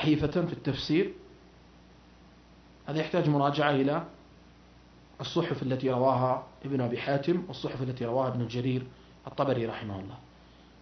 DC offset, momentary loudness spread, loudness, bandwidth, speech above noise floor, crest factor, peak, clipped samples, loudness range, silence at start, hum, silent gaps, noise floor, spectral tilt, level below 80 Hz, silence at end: under 0.1%; 15 LU; -30 LUFS; 6.4 kHz; 26 dB; 22 dB; -10 dBFS; under 0.1%; 3 LU; 0 s; none; none; -55 dBFS; -7.5 dB/octave; -58 dBFS; 0.6 s